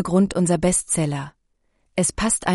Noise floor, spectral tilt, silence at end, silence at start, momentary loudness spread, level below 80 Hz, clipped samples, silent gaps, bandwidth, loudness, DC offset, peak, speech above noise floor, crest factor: -67 dBFS; -4.5 dB/octave; 0 s; 0 s; 11 LU; -42 dBFS; under 0.1%; none; 11.5 kHz; -21 LUFS; under 0.1%; -6 dBFS; 47 dB; 16 dB